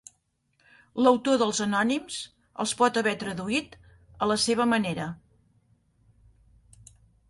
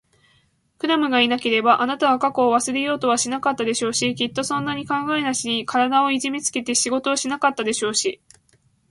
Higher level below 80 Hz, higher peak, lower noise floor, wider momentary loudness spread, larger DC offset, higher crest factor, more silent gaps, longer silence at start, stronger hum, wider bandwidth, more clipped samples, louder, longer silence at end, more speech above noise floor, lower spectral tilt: about the same, -62 dBFS vs -64 dBFS; second, -8 dBFS vs -4 dBFS; first, -71 dBFS vs -62 dBFS; first, 14 LU vs 6 LU; neither; about the same, 20 dB vs 18 dB; neither; about the same, 0.95 s vs 0.85 s; neither; about the same, 11.5 kHz vs 11.5 kHz; neither; second, -26 LUFS vs -20 LUFS; first, 2.15 s vs 0.75 s; first, 46 dB vs 41 dB; about the same, -3.5 dB/octave vs -2.5 dB/octave